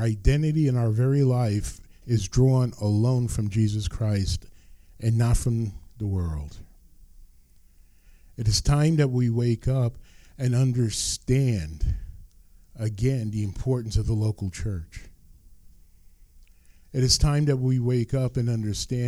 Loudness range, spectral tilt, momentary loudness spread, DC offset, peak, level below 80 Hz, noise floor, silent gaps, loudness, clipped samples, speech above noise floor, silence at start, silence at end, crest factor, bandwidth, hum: 6 LU; -6 dB/octave; 11 LU; under 0.1%; -6 dBFS; -36 dBFS; -54 dBFS; none; -25 LUFS; under 0.1%; 30 dB; 0 s; 0 s; 18 dB; 13 kHz; none